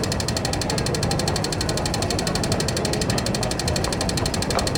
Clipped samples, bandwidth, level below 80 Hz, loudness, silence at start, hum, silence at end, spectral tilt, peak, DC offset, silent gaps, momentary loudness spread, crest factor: under 0.1%; 20 kHz; -34 dBFS; -23 LUFS; 0 s; none; 0 s; -4 dB/octave; -6 dBFS; under 0.1%; none; 1 LU; 16 dB